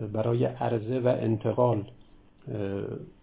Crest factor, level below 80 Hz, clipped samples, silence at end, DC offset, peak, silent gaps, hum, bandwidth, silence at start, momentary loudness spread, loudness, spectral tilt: 18 dB; -58 dBFS; under 0.1%; 0.15 s; under 0.1%; -10 dBFS; none; none; 4 kHz; 0 s; 13 LU; -28 LUFS; -12 dB/octave